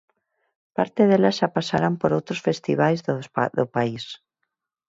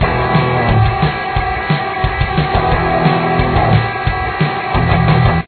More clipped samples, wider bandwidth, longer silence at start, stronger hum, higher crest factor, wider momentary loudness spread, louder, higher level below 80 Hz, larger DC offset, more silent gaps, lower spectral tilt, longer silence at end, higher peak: neither; first, 7.8 kHz vs 4.6 kHz; first, 0.8 s vs 0 s; neither; about the same, 18 dB vs 14 dB; first, 11 LU vs 5 LU; second, -22 LUFS vs -14 LUFS; second, -62 dBFS vs -24 dBFS; neither; neither; second, -6.5 dB/octave vs -10 dB/octave; first, 0.75 s vs 0 s; second, -4 dBFS vs 0 dBFS